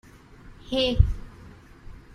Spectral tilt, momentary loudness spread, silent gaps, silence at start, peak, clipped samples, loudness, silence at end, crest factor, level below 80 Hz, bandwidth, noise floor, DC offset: -6.5 dB/octave; 25 LU; none; 0.45 s; -4 dBFS; under 0.1%; -25 LUFS; 0.15 s; 24 dB; -32 dBFS; 10.5 kHz; -48 dBFS; under 0.1%